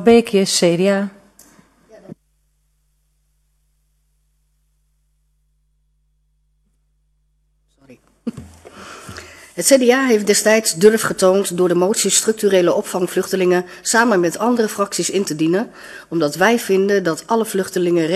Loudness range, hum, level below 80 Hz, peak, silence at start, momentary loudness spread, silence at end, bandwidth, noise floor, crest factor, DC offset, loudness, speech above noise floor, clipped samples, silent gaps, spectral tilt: 13 LU; 50 Hz at -65 dBFS; -58 dBFS; 0 dBFS; 0 s; 18 LU; 0 s; 14 kHz; -63 dBFS; 18 dB; under 0.1%; -16 LUFS; 48 dB; under 0.1%; none; -3.5 dB/octave